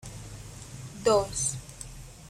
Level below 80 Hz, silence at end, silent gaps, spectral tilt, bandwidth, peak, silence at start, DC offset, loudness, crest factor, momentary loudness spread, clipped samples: -50 dBFS; 0 s; none; -3.5 dB/octave; 16 kHz; -12 dBFS; 0 s; under 0.1%; -27 LUFS; 20 dB; 18 LU; under 0.1%